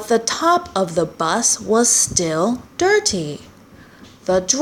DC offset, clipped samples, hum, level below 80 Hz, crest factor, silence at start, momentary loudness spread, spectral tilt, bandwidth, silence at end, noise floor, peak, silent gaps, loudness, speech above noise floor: under 0.1%; under 0.1%; none; -50 dBFS; 18 dB; 0 s; 9 LU; -2.5 dB/octave; 17 kHz; 0 s; -44 dBFS; -2 dBFS; none; -17 LUFS; 27 dB